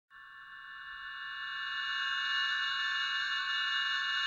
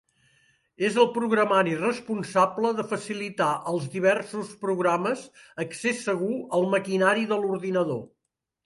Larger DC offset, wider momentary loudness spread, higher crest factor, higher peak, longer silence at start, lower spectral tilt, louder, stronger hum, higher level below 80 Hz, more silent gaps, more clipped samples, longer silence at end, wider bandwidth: neither; first, 17 LU vs 9 LU; second, 14 dB vs 20 dB; second, -22 dBFS vs -6 dBFS; second, 0.1 s vs 0.8 s; second, 3 dB/octave vs -5 dB/octave; second, -32 LUFS vs -25 LUFS; neither; about the same, -76 dBFS vs -72 dBFS; neither; neither; second, 0 s vs 0.6 s; second, 9.6 kHz vs 11.5 kHz